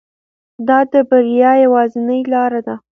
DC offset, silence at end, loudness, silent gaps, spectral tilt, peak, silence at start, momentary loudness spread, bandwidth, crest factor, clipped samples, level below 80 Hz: under 0.1%; 0.2 s; -13 LUFS; none; -7.5 dB/octave; 0 dBFS; 0.6 s; 8 LU; 3.6 kHz; 14 dB; under 0.1%; -66 dBFS